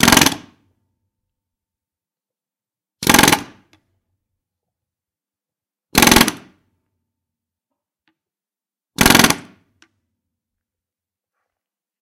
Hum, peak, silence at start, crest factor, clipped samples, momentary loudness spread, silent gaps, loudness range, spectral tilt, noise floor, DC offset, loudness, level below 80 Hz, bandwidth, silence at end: none; 0 dBFS; 0 s; 20 dB; under 0.1%; 11 LU; none; 1 LU; -2.5 dB/octave; under -90 dBFS; under 0.1%; -13 LUFS; -40 dBFS; over 20 kHz; 2.6 s